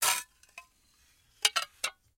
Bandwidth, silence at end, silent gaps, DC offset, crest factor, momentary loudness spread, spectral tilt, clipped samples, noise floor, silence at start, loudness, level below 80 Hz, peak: 17 kHz; 0.25 s; none; under 0.1%; 28 dB; 24 LU; 3 dB/octave; under 0.1%; -67 dBFS; 0 s; -30 LUFS; -72 dBFS; -8 dBFS